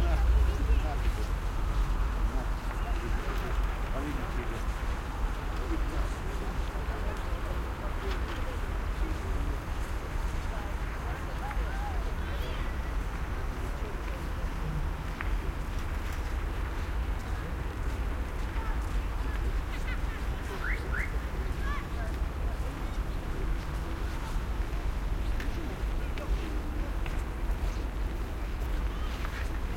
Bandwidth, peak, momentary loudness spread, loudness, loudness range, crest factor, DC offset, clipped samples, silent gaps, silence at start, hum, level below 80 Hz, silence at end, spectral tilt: 16 kHz; -14 dBFS; 4 LU; -35 LUFS; 2 LU; 16 dB; under 0.1%; under 0.1%; none; 0 s; none; -32 dBFS; 0 s; -6 dB/octave